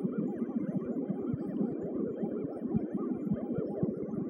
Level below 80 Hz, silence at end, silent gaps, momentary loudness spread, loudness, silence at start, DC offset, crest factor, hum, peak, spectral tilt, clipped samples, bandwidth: -62 dBFS; 0 s; none; 2 LU; -35 LUFS; 0 s; under 0.1%; 16 dB; none; -18 dBFS; -12 dB/octave; under 0.1%; 3.3 kHz